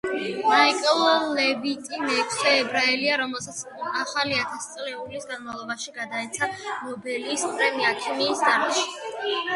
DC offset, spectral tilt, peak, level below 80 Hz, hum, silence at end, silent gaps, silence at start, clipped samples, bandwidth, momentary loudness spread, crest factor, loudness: under 0.1%; -1.5 dB/octave; -4 dBFS; -68 dBFS; none; 0 s; none; 0.05 s; under 0.1%; 11.5 kHz; 13 LU; 20 dB; -24 LUFS